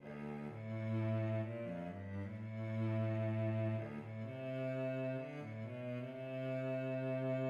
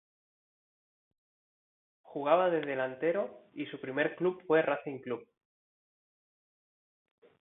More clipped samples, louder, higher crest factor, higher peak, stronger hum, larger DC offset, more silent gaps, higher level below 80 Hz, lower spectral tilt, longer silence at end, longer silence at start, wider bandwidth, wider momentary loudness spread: neither; second, -42 LUFS vs -32 LUFS; second, 12 dB vs 22 dB; second, -28 dBFS vs -12 dBFS; neither; neither; neither; first, -78 dBFS vs -84 dBFS; about the same, -9.5 dB/octave vs -9 dB/octave; second, 0 s vs 2.15 s; second, 0 s vs 2.1 s; first, 5.4 kHz vs 4 kHz; second, 8 LU vs 14 LU